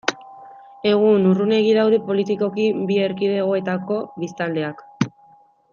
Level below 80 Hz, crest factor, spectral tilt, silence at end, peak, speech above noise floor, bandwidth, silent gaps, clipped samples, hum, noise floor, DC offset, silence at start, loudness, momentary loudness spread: -68 dBFS; 18 dB; -6.5 dB/octave; 0.65 s; -2 dBFS; 34 dB; 7.2 kHz; none; under 0.1%; none; -53 dBFS; under 0.1%; 0.05 s; -20 LUFS; 10 LU